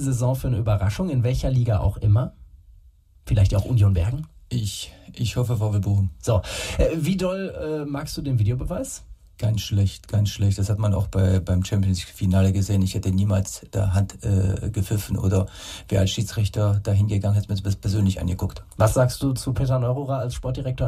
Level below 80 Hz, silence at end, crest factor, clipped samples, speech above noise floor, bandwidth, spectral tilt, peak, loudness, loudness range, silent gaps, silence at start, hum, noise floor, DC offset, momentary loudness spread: -36 dBFS; 0 s; 18 dB; under 0.1%; 30 dB; 14 kHz; -6.5 dB/octave; -4 dBFS; -23 LUFS; 3 LU; none; 0 s; none; -52 dBFS; under 0.1%; 8 LU